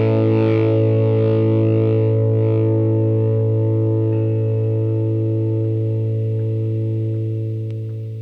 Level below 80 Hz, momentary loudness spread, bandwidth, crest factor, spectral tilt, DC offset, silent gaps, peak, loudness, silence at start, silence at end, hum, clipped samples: -56 dBFS; 6 LU; 3.9 kHz; 12 dB; -11.5 dB/octave; under 0.1%; none; -6 dBFS; -18 LUFS; 0 s; 0 s; none; under 0.1%